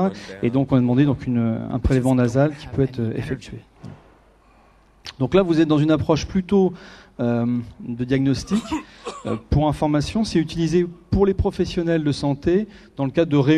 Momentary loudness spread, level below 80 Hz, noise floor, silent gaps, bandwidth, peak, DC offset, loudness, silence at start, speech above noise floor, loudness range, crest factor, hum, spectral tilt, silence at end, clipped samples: 12 LU; -38 dBFS; -53 dBFS; none; 12 kHz; -4 dBFS; under 0.1%; -21 LUFS; 0 s; 33 dB; 3 LU; 18 dB; none; -7.5 dB/octave; 0 s; under 0.1%